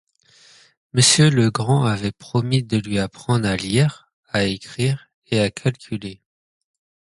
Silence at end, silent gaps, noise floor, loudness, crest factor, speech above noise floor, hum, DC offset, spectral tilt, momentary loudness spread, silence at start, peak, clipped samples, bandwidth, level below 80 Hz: 1.05 s; 4.13-4.23 s, 5.14-5.22 s; -53 dBFS; -20 LUFS; 20 dB; 34 dB; none; under 0.1%; -4.5 dB/octave; 11 LU; 0.95 s; -2 dBFS; under 0.1%; 11.5 kHz; -50 dBFS